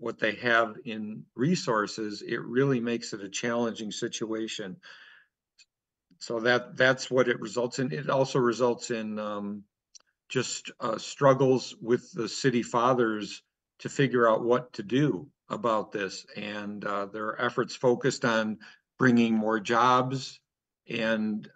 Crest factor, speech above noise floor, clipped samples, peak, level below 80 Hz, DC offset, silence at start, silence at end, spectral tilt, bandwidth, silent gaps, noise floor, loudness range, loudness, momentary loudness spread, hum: 20 dB; 43 dB; under 0.1%; -8 dBFS; -76 dBFS; under 0.1%; 0 s; 0.1 s; -5 dB/octave; 9.2 kHz; none; -71 dBFS; 5 LU; -28 LUFS; 13 LU; none